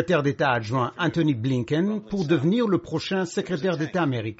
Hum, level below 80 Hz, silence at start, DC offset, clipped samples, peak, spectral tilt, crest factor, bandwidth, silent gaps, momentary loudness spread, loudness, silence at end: none; -58 dBFS; 0 s; under 0.1%; under 0.1%; -8 dBFS; -5.5 dB/octave; 16 dB; 8 kHz; none; 5 LU; -24 LUFS; 0.05 s